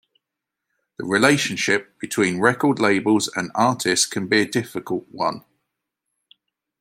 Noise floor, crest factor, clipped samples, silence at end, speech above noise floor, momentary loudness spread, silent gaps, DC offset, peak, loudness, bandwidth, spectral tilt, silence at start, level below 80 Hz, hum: -84 dBFS; 22 dB; under 0.1%; 1.4 s; 63 dB; 10 LU; none; under 0.1%; 0 dBFS; -20 LUFS; 16.5 kHz; -3.5 dB/octave; 1 s; -66 dBFS; none